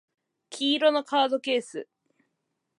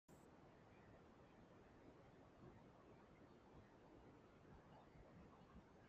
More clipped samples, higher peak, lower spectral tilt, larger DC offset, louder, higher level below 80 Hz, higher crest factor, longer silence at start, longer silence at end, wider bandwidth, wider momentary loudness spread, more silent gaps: neither; first, -10 dBFS vs -50 dBFS; second, -2.5 dB/octave vs -6 dB/octave; neither; first, -25 LUFS vs -68 LUFS; second, -86 dBFS vs -78 dBFS; about the same, 18 dB vs 16 dB; first, 0.5 s vs 0.1 s; first, 0.95 s vs 0 s; first, 11.5 kHz vs 7.4 kHz; first, 17 LU vs 2 LU; neither